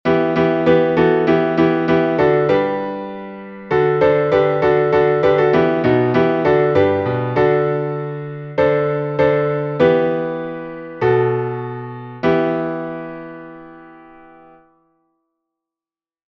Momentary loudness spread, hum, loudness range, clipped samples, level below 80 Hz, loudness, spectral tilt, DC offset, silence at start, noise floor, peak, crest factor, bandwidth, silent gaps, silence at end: 14 LU; none; 9 LU; under 0.1%; -50 dBFS; -16 LUFS; -8.5 dB/octave; under 0.1%; 0.05 s; under -90 dBFS; -2 dBFS; 16 dB; 6.2 kHz; none; 2.45 s